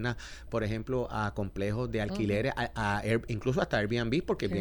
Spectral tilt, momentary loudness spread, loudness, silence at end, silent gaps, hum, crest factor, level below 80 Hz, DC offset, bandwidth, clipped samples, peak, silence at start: -6.5 dB/octave; 5 LU; -32 LUFS; 0 s; none; none; 18 dB; -46 dBFS; under 0.1%; 19 kHz; under 0.1%; -14 dBFS; 0 s